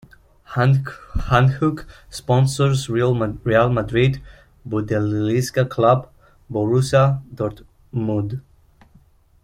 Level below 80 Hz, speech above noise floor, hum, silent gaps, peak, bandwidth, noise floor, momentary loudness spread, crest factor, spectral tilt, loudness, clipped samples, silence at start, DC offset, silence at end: -40 dBFS; 34 dB; none; none; -2 dBFS; 15 kHz; -53 dBFS; 13 LU; 18 dB; -7 dB/octave; -20 LUFS; under 0.1%; 0.5 s; under 0.1%; 1.05 s